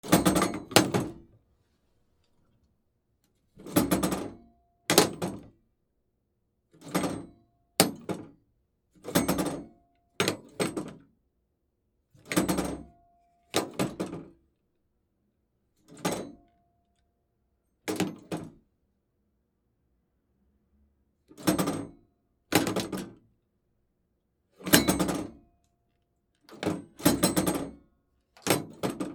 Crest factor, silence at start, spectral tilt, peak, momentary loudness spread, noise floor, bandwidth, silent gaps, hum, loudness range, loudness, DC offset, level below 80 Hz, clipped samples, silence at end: 32 dB; 0.05 s; -4 dB/octave; 0 dBFS; 18 LU; -76 dBFS; 19.5 kHz; none; none; 11 LU; -29 LUFS; under 0.1%; -56 dBFS; under 0.1%; 0 s